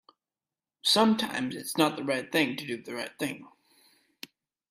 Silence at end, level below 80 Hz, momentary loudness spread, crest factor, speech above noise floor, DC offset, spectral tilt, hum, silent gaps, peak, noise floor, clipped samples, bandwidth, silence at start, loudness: 1.2 s; -74 dBFS; 24 LU; 22 dB; over 62 dB; under 0.1%; -3.5 dB/octave; none; none; -10 dBFS; under -90 dBFS; under 0.1%; 16 kHz; 0.85 s; -28 LUFS